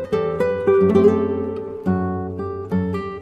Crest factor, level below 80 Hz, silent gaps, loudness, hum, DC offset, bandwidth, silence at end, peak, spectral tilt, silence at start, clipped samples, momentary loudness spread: 18 dB; -50 dBFS; none; -20 LUFS; none; under 0.1%; 6.8 kHz; 0 s; -2 dBFS; -9 dB/octave; 0 s; under 0.1%; 12 LU